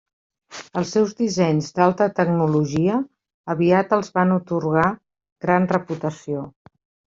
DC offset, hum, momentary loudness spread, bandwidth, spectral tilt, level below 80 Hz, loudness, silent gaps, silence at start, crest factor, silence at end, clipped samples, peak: under 0.1%; none; 12 LU; 7.6 kHz; -7 dB/octave; -58 dBFS; -21 LUFS; 3.34-3.44 s, 5.32-5.36 s; 0.5 s; 18 dB; 0.65 s; under 0.1%; -2 dBFS